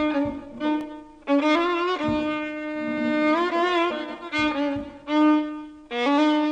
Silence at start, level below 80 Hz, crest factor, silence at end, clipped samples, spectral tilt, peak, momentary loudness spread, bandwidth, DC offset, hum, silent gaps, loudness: 0 s; -54 dBFS; 14 dB; 0 s; under 0.1%; -5 dB/octave; -10 dBFS; 11 LU; 8.2 kHz; under 0.1%; none; none; -24 LUFS